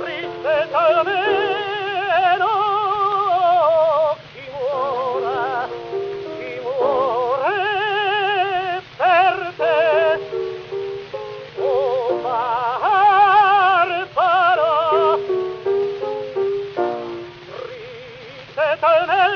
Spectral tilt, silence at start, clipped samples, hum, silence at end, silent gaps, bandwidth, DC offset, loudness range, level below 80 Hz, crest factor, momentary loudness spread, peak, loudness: -5 dB/octave; 0 s; under 0.1%; none; 0 s; none; 6.6 kHz; under 0.1%; 7 LU; -60 dBFS; 14 dB; 14 LU; -4 dBFS; -18 LUFS